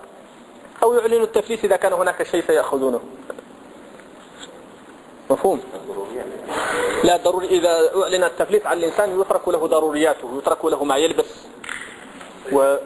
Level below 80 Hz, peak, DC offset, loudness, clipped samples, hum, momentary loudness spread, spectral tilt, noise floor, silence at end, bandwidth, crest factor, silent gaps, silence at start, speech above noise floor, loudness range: -56 dBFS; -2 dBFS; under 0.1%; -20 LUFS; under 0.1%; none; 18 LU; -3.5 dB/octave; -43 dBFS; 0 s; 11 kHz; 20 dB; none; 0 s; 24 dB; 8 LU